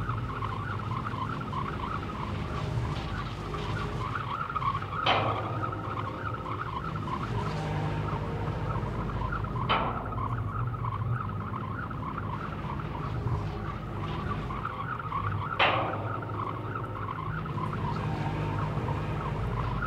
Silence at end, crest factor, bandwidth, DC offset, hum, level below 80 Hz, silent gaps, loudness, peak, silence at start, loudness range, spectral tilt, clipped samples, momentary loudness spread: 0 s; 22 dB; 10 kHz; under 0.1%; none; -44 dBFS; none; -32 LUFS; -10 dBFS; 0 s; 3 LU; -7 dB/octave; under 0.1%; 7 LU